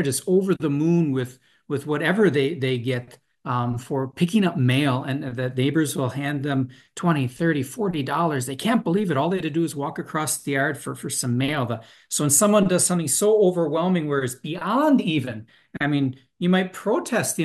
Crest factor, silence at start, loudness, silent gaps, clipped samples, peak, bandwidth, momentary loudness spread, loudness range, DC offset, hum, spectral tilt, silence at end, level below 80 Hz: 18 dB; 0 s; -23 LUFS; none; under 0.1%; -6 dBFS; 12.5 kHz; 9 LU; 4 LU; under 0.1%; none; -5 dB/octave; 0 s; -64 dBFS